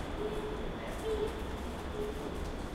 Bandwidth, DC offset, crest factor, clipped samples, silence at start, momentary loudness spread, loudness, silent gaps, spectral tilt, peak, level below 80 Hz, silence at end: 16 kHz; under 0.1%; 14 dB; under 0.1%; 0 s; 5 LU; -39 LUFS; none; -6 dB/octave; -22 dBFS; -42 dBFS; 0 s